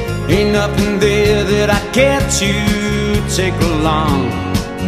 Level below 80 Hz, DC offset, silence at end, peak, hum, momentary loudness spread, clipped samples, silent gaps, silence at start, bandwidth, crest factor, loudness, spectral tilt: -26 dBFS; under 0.1%; 0 s; 0 dBFS; none; 4 LU; under 0.1%; none; 0 s; 15.5 kHz; 14 dB; -14 LUFS; -5 dB/octave